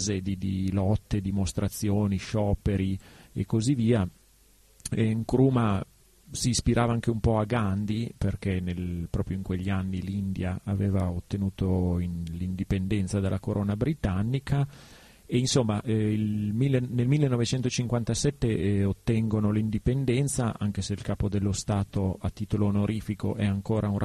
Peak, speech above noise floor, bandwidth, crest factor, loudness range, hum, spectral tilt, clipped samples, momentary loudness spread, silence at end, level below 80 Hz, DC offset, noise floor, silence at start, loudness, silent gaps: -10 dBFS; 32 dB; 13 kHz; 18 dB; 3 LU; none; -6.5 dB/octave; under 0.1%; 7 LU; 0 s; -44 dBFS; under 0.1%; -59 dBFS; 0 s; -28 LUFS; none